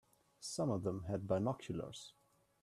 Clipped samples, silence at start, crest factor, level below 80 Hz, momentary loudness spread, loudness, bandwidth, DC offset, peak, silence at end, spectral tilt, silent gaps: under 0.1%; 0.4 s; 20 dB; -70 dBFS; 13 LU; -41 LUFS; 14 kHz; under 0.1%; -22 dBFS; 0.5 s; -6 dB/octave; none